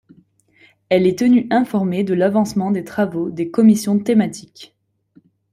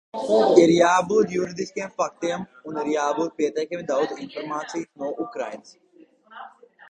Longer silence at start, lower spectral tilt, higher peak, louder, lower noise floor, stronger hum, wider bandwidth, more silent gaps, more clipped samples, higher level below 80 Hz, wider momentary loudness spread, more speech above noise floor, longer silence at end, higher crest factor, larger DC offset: first, 0.9 s vs 0.15 s; first, -6.5 dB/octave vs -5 dB/octave; about the same, -2 dBFS vs -2 dBFS; first, -17 LUFS vs -23 LUFS; about the same, -55 dBFS vs -52 dBFS; neither; first, 15 kHz vs 9.6 kHz; neither; neither; first, -60 dBFS vs -66 dBFS; second, 8 LU vs 17 LU; first, 38 dB vs 29 dB; first, 0.9 s vs 0.4 s; second, 14 dB vs 22 dB; neither